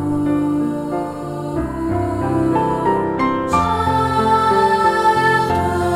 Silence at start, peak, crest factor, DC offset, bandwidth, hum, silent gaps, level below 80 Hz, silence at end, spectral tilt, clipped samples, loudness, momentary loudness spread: 0 s; -4 dBFS; 14 dB; under 0.1%; 16 kHz; none; none; -38 dBFS; 0 s; -6.5 dB/octave; under 0.1%; -17 LUFS; 9 LU